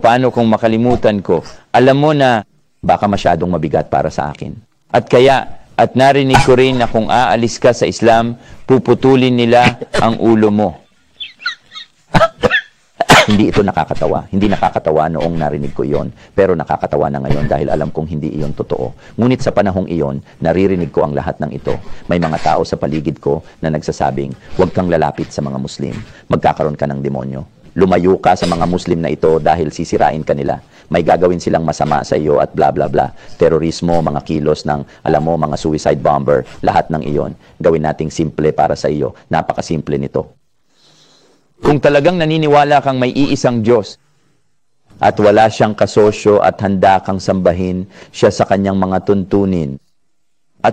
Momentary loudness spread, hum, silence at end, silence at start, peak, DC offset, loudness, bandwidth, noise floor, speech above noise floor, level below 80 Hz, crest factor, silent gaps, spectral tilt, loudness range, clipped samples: 11 LU; none; 0 s; 0 s; 0 dBFS; under 0.1%; -14 LUFS; 14.5 kHz; -70 dBFS; 57 dB; -36 dBFS; 14 dB; none; -6 dB/octave; 5 LU; under 0.1%